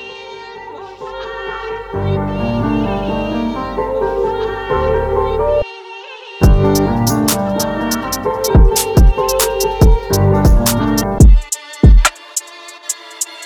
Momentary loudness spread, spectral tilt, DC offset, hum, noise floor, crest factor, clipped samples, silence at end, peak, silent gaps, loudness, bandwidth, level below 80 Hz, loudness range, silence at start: 17 LU; -5.5 dB/octave; under 0.1%; none; -34 dBFS; 14 dB; under 0.1%; 0 s; 0 dBFS; none; -15 LUFS; over 20 kHz; -16 dBFS; 7 LU; 0 s